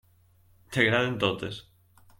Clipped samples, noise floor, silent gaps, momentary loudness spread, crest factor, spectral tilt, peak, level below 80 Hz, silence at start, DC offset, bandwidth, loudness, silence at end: under 0.1%; -61 dBFS; none; 14 LU; 22 dB; -5.5 dB/octave; -8 dBFS; -62 dBFS; 0.7 s; under 0.1%; 16.5 kHz; -26 LUFS; 0.6 s